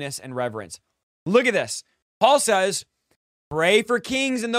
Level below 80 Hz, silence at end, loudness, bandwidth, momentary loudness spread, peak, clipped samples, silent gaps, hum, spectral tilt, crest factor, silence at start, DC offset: -62 dBFS; 0 s; -21 LUFS; 16 kHz; 16 LU; -2 dBFS; under 0.1%; 1.03-1.26 s, 2.02-2.21 s, 3.16-3.51 s; none; -3 dB/octave; 20 dB; 0 s; under 0.1%